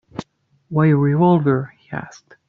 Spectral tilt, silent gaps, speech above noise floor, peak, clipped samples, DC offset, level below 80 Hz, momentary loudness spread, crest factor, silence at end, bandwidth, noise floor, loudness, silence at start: -9.5 dB/octave; none; 32 dB; -2 dBFS; under 0.1%; under 0.1%; -56 dBFS; 17 LU; 16 dB; 0.4 s; 7 kHz; -49 dBFS; -17 LUFS; 0.15 s